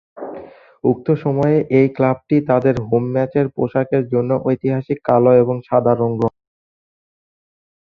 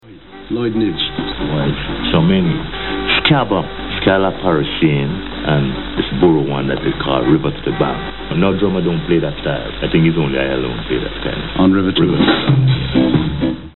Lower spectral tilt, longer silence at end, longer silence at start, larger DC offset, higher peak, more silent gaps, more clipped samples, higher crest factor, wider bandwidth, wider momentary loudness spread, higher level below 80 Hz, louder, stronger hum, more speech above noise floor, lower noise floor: first, -10.5 dB/octave vs -5 dB/octave; first, 1.65 s vs 0 s; first, 0.15 s vs 0 s; second, under 0.1% vs 2%; about the same, 0 dBFS vs 0 dBFS; neither; neither; about the same, 18 dB vs 16 dB; first, 6.4 kHz vs 4.2 kHz; about the same, 7 LU vs 8 LU; second, -54 dBFS vs -32 dBFS; about the same, -17 LUFS vs -16 LUFS; neither; about the same, 21 dB vs 21 dB; about the same, -37 dBFS vs -36 dBFS